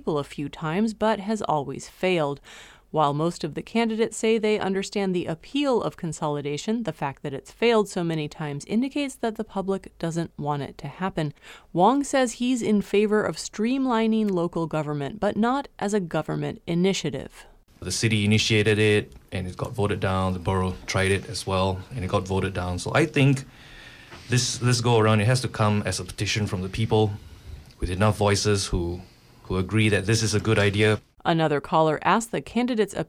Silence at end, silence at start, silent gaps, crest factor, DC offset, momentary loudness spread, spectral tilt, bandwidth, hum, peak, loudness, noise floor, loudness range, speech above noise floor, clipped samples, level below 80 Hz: 0.05 s; 0.05 s; none; 18 dB; under 0.1%; 11 LU; -5.5 dB/octave; 15.5 kHz; none; -6 dBFS; -24 LUFS; -45 dBFS; 4 LU; 21 dB; under 0.1%; -48 dBFS